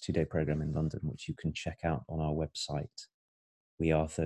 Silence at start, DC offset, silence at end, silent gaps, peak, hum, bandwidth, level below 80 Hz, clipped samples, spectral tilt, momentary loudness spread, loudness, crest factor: 0 s; under 0.1%; 0 s; 3.14-3.78 s; -14 dBFS; none; 11 kHz; -48 dBFS; under 0.1%; -6.5 dB/octave; 8 LU; -35 LUFS; 20 dB